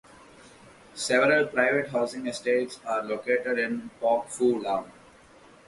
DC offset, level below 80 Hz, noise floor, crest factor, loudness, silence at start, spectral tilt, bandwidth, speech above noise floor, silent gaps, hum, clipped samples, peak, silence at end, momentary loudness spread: under 0.1%; -68 dBFS; -54 dBFS; 20 dB; -26 LUFS; 0.45 s; -4 dB/octave; 11.5 kHz; 28 dB; none; none; under 0.1%; -8 dBFS; 0.75 s; 9 LU